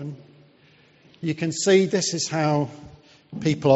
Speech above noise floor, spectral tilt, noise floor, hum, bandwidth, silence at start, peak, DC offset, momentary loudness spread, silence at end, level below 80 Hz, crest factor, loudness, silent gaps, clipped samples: 34 dB; -5 dB/octave; -56 dBFS; none; 8 kHz; 0 s; -4 dBFS; under 0.1%; 20 LU; 0 s; -62 dBFS; 20 dB; -23 LUFS; none; under 0.1%